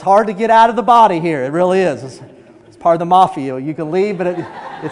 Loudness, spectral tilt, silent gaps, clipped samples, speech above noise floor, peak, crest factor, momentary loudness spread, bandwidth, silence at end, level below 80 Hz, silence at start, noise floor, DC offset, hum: -14 LUFS; -6.5 dB/octave; none; 0.2%; 27 dB; 0 dBFS; 14 dB; 15 LU; 11 kHz; 0 s; -56 dBFS; 0 s; -41 dBFS; under 0.1%; none